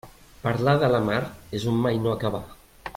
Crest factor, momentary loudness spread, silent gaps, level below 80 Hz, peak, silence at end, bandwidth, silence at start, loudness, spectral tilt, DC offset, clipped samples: 18 dB; 11 LU; none; -50 dBFS; -8 dBFS; 0.05 s; 16.5 kHz; 0.05 s; -24 LUFS; -7 dB/octave; under 0.1%; under 0.1%